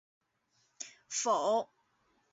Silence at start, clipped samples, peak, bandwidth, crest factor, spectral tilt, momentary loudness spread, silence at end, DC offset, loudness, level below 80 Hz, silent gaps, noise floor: 0.8 s; under 0.1%; -18 dBFS; 8 kHz; 18 dB; -1.5 dB/octave; 17 LU; 0.65 s; under 0.1%; -32 LUFS; -88 dBFS; none; -76 dBFS